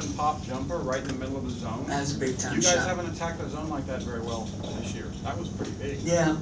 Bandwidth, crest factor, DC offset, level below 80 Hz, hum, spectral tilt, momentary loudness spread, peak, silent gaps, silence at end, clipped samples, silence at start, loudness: 8 kHz; 20 dB; under 0.1%; -44 dBFS; none; -4 dB/octave; 10 LU; -8 dBFS; none; 0 s; under 0.1%; 0 s; -29 LUFS